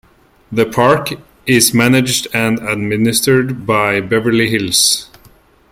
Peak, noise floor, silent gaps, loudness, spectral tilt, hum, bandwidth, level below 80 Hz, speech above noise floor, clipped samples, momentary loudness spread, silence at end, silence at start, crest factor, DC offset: 0 dBFS; -47 dBFS; none; -13 LUFS; -3.5 dB/octave; none; 16.5 kHz; -48 dBFS; 34 dB; under 0.1%; 7 LU; 0.65 s; 0.5 s; 14 dB; under 0.1%